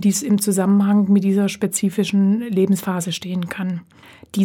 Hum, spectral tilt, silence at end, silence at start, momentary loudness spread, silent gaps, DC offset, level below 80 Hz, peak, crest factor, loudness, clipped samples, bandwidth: none; -5.5 dB/octave; 0 s; 0 s; 10 LU; none; under 0.1%; -64 dBFS; -6 dBFS; 12 dB; -19 LUFS; under 0.1%; 17 kHz